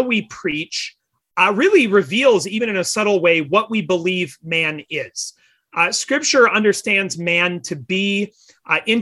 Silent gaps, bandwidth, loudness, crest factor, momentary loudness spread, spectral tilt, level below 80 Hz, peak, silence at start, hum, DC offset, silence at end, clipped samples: none; 12.5 kHz; -17 LUFS; 16 dB; 12 LU; -3.5 dB/octave; -64 dBFS; -2 dBFS; 0 s; none; under 0.1%; 0 s; under 0.1%